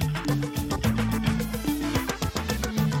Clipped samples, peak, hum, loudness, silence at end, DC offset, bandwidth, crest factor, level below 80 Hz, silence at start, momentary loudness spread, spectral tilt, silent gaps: under 0.1%; -10 dBFS; none; -27 LUFS; 0 s; under 0.1%; 17 kHz; 16 dB; -36 dBFS; 0 s; 3 LU; -5.5 dB/octave; none